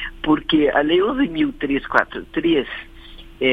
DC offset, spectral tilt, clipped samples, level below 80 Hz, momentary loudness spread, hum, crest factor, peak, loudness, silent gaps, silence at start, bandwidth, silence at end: under 0.1%; -7 dB/octave; under 0.1%; -42 dBFS; 7 LU; none; 20 dB; 0 dBFS; -19 LUFS; none; 0 s; 5.8 kHz; 0 s